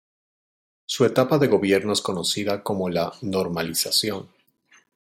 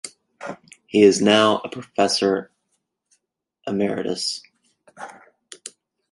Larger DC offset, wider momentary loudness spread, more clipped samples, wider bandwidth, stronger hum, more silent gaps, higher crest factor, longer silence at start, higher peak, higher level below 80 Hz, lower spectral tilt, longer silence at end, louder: neither; second, 8 LU vs 24 LU; neither; first, 16.5 kHz vs 11.5 kHz; neither; neither; about the same, 18 dB vs 20 dB; first, 0.9 s vs 0.05 s; second, -6 dBFS vs -2 dBFS; about the same, -64 dBFS vs -66 dBFS; about the same, -4 dB/octave vs -4 dB/octave; first, 0.85 s vs 0.45 s; about the same, -22 LUFS vs -20 LUFS